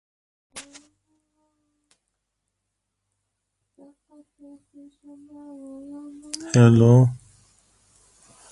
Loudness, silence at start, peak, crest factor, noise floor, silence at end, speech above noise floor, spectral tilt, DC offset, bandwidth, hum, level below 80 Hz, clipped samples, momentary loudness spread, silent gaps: -17 LUFS; 0.55 s; -2 dBFS; 22 dB; -80 dBFS; 1.35 s; 59 dB; -7.5 dB/octave; under 0.1%; 11.5 kHz; none; -58 dBFS; under 0.1%; 27 LU; none